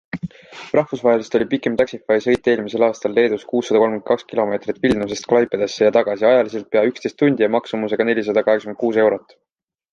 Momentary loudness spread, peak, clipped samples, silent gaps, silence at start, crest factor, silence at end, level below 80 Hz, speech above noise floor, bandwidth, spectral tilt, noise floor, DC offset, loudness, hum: 6 LU; -2 dBFS; under 0.1%; none; 0.15 s; 16 dB; 0.75 s; -54 dBFS; 64 dB; 8.4 kHz; -5.5 dB/octave; -82 dBFS; under 0.1%; -18 LUFS; none